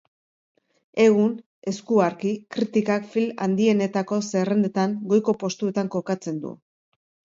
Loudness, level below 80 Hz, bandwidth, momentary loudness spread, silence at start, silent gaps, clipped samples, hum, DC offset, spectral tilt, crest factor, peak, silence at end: -23 LUFS; -70 dBFS; 7.8 kHz; 11 LU; 0.95 s; 1.46-1.62 s; under 0.1%; none; under 0.1%; -6.5 dB/octave; 18 dB; -6 dBFS; 0.8 s